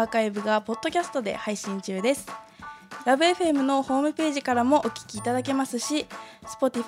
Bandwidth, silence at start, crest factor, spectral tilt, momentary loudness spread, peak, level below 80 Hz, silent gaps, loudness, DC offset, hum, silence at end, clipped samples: 16 kHz; 0 s; 16 dB; -4 dB/octave; 18 LU; -8 dBFS; -64 dBFS; none; -26 LUFS; under 0.1%; none; 0 s; under 0.1%